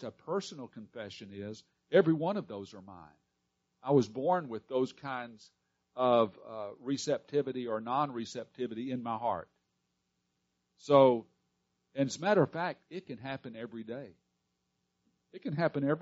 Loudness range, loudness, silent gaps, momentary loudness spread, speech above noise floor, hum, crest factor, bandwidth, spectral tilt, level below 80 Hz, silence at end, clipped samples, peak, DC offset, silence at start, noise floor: 6 LU; -32 LUFS; none; 18 LU; 49 dB; none; 24 dB; 7.6 kHz; -5.5 dB/octave; -78 dBFS; 0 s; under 0.1%; -10 dBFS; under 0.1%; 0 s; -81 dBFS